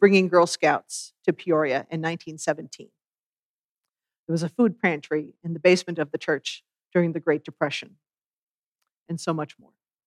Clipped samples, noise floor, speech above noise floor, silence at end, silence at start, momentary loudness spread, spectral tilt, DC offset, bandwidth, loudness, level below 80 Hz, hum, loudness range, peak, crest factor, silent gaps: under 0.1%; under -90 dBFS; over 66 dB; 0.6 s; 0 s; 14 LU; -5.5 dB/octave; under 0.1%; 12.5 kHz; -25 LUFS; -84 dBFS; none; 5 LU; -4 dBFS; 20 dB; 3.08-3.12 s, 3.19-3.33 s, 3.39-3.83 s, 4.19-4.27 s, 8.24-8.75 s, 8.96-9.06 s